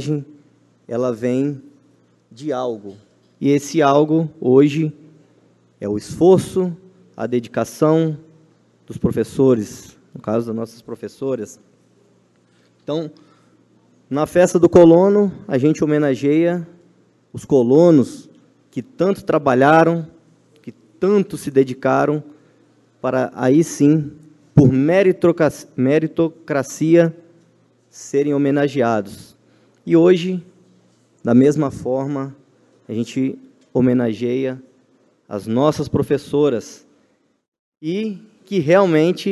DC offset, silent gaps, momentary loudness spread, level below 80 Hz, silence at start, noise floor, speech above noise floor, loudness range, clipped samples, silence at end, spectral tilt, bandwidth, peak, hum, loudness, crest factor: under 0.1%; 37.48-37.52 s, 37.59-37.72 s; 18 LU; -52 dBFS; 0 s; -61 dBFS; 45 dB; 7 LU; under 0.1%; 0 s; -7 dB/octave; 12.5 kHz; 0 dBFS; none; -17 LUFS; 18 dB